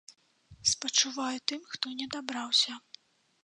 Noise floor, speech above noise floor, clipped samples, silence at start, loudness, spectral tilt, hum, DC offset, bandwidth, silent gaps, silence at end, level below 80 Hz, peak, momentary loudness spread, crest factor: -57 dBFS; 25 dB; under 0.1%; 0.1 s; -29 LUFS; 0 dB/octave; none; under 0.1%; 11 kHz; none; 0.65 s; -68 dBFS; -10 dBFS; 10 LU; 24 dB